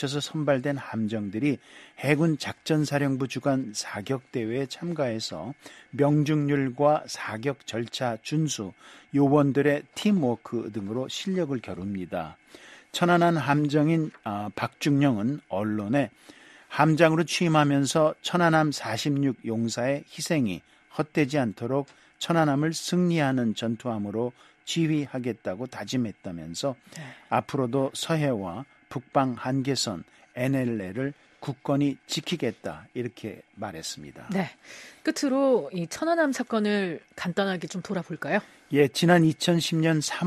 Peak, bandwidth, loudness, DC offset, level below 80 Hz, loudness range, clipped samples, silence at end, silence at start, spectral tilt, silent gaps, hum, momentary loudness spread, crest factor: -4 dBFS; 13.5 kHz; -27 LUFS; under 0.1%; -66 dBFS; 6 LU; under 0.1%; 0 s; 0 s; -5.5 dB/octave; none; none; 13 LU; 22 dB